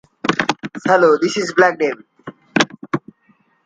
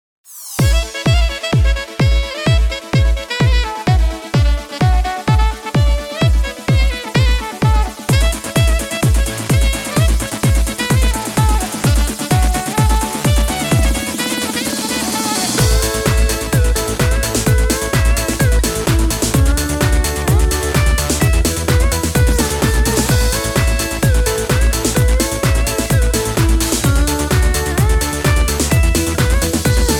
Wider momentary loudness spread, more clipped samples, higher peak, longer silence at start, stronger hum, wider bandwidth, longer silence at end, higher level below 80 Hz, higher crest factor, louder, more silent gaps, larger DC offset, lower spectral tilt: first, 13 LU vs 2 LU; neither; about the same, 0 dBFS vs 0 dBFS; about the same, 0.25 s vs 0.3 s; neither; second, 9.4 kHz vs 18.5 kHz; first, 0.65 s vs 0 s; second, -60 dBFS vs -18 dBFS; about the same, 18 dB vs 14 dB; about the same, -17 LUFS vs -15 LUFS; neither; neither; about the same, -4.5 dB/octave vs -4.5 dB/octave